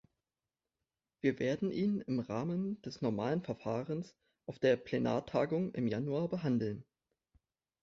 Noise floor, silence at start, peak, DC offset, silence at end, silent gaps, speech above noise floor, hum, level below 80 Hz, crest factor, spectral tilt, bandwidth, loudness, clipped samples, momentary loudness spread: under -90 dBFS; 1.25 s; -18 dBFS; under 0.1%; 1 s; none; over 55 dB; none; -70 dBFS; 18 dB; -6.5 dB/octave; 7.6 kHz; -36 LUFS; under 0.1%; 8 LU